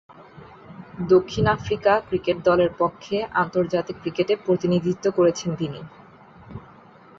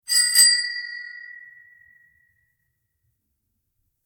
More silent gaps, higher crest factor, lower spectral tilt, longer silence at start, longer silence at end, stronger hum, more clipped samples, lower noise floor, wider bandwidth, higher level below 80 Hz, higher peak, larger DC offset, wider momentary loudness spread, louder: neither; second, 18 dB vs 24 dB; first, -6.5 dB/octave vs 5.5 dB/octave; about the same, 0.2 s vs 0.1 s; second, 0.6 s vs 2.65 s; neither; neither; second, -48 dBFS vs -75 dBFS; second, 7.6 kHz vs over 20 kHz; first, -50 dBFS vs -76 dBFS; second, -6 dBFS vs -2 dBFS; neither; second, 22 LU vs 25 LU; second, -22 LUFS vs -16 LUFS